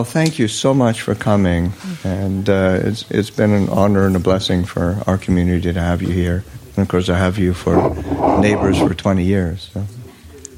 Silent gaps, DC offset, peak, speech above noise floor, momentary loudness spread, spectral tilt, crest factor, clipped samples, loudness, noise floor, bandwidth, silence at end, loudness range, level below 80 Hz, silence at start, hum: none; under 0.1%; -2 dBFS; 22 dB; 9 LU; -6.5 dB/octave; 14 dB; under 0.1%; -17 LUFS; -38 dBFS; 16 kHz; 0 s; 1 LU; -36 dBFS; 0 s; none